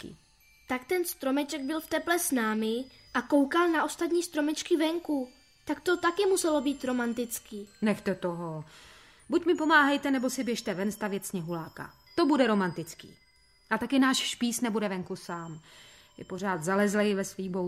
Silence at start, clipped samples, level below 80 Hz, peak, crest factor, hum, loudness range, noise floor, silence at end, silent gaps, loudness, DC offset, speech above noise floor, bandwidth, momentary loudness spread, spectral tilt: 0 s; under 0.1%; -66 dBFS; -8 dBFS; 20 dB; none; 3 LU; -62 dBFS; 0 s; none; -29 LUFS; under 0.1%; 33 dB; 16 kHz; 14 LU; -4 dB/octave